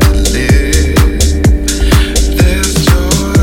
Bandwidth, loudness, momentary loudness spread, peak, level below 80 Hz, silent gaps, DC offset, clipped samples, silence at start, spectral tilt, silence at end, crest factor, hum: 17.5 kHz; -10 LUFS; 1 LU; 0 dBFS; -12 dBFS; none; under 0.1%; 0.3%; 0 s; -4.5 dB/octave; 0 s; 8 dB; none